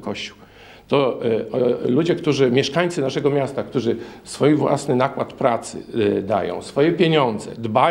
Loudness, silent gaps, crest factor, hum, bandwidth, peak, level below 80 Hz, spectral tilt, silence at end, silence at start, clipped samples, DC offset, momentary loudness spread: -20 LUFS; none; 18 dB; none; 12 kHz; -2 dBFS; -58 dBFS; -6 dB/octave; 0 s; 0 s; under 0.1%; under 0.1%; 9 LU